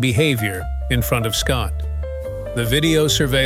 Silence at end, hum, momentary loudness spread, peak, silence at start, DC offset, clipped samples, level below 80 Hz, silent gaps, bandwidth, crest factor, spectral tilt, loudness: 0 s; none; 11 LU; -4 dBFS; 0 s; under 0.1%; under 0.1%; -28 dBFS; none; 16.5 kHz; 16 dB; -4.5 dB/octave; -19 LUFS